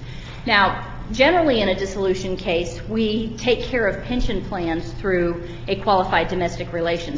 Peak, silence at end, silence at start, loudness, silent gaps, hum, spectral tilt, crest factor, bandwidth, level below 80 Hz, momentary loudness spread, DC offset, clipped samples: -2 dBFS; 0 s; 0 s; -21 LUFS; none; none; -5.5 dB/octave; 20 dB; 7.8 kHz; -34 dBFS; 9 LU; under 0.1%; under 0.1%